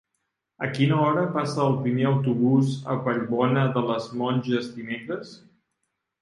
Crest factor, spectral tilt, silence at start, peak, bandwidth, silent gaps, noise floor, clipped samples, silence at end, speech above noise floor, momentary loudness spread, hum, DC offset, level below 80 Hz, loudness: 16 dB; -7.5 dB/octave; 0.6 s; -8 dBFS; 11 kHz; none; -79 dBFS; under 0.1%; 0.85 s; 55 dB; 11 LU; none; under 0.1%; -66 dBFS; -24 LUFS